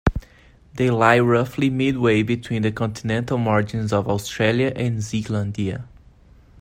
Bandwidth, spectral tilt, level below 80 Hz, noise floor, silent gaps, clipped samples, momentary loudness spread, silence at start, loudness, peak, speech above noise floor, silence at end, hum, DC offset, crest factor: 16 kHz; -6.5 dB/octave; -38 dBFS; -50 dBFS; none; under 0.1%; 9 LU; 0.05 s; -21 LUFS; -2 dBFS; 30 dB; 0.75 s; none; under 0.1%; 20 dB